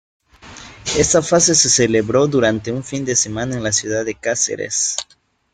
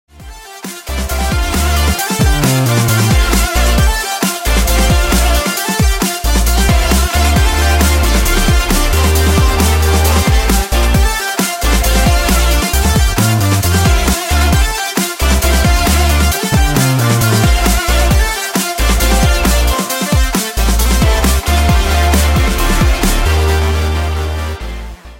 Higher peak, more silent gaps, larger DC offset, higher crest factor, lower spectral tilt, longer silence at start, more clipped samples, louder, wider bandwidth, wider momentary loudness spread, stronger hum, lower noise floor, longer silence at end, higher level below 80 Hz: about the same, -2 dBFS vs 0 dBFS; neither; neither; about the same, 16 dB vs 12 dB; about the same, -3 dB/octave vs -4 dB/octave; first, 0.45 s vs 0.2 s; neither; second, -16 LUFS vs -12 LUFS; second, 11 kHz vs 16.5 kHz; first, 11 LU vs 4 LU; neither; first, -39 dBFS vs -32 dBFS; first, 0.5 s vs 0 s; second, -46 dBFS vs -14 dBFS